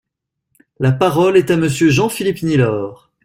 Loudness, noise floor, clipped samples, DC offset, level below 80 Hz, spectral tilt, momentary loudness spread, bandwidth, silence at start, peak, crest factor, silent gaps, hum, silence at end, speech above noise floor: -15 LUFS; -75 dBFS; under 0.1%; under 0.1%; -48 dBFS; -6 dB/octave; 7 LU; 16 kHz; 0.8 s; -2 dBFS; 14 dB; none; none; 0.3 s; 61 dB